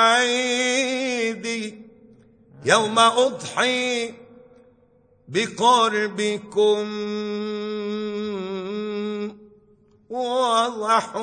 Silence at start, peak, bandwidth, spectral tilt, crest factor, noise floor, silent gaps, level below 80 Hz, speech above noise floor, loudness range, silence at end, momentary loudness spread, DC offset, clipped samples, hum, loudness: 0 s; -2 dBFS; 9.4 kHz; -2.5 dB/octave; 20 dB; -58 dBFS; none; -70 dBFS; 37 dB; 6 LU; 0 s; 12 LU; under 0.1%; under 0.1%; none; -22 LUFS